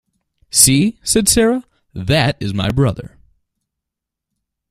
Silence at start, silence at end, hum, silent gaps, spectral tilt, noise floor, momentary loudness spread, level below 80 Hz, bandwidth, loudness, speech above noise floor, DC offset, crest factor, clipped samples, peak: 0.55 s; 1.65 s; none; none; -3.5 dB/octave; -82 dBFS; 14 LU; -38 dBFS; 16 kHz; -14 LUFS; 68 dB; under 0.1%; 18 dB; under 0.1%; 0 dBFS